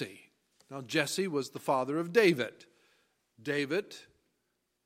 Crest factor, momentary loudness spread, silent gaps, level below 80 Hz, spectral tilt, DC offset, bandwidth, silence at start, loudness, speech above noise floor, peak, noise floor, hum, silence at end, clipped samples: 22 dB; 20 LU; none; -82 dBFS; -4.5 dB/octave; under 0.1%; 16 kHz; 0 s; -31 LUFS; 49 dB; -12 dBFS; -80 dBFS; none; 0.85 s; under 0.1%